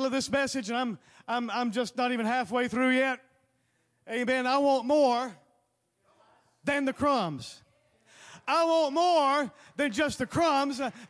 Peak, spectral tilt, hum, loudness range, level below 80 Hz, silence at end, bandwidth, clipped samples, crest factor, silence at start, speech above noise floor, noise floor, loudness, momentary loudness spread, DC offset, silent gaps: -14 dBFS; -4 dB/octave; none; 3 LU; -66 dBFS; 0.05 s; 11 kHz; under 0.1%; 14 dB; 0 s; 46 dB; -74 dBFS; -28 LUFS; 11 LU; under 0.1%; none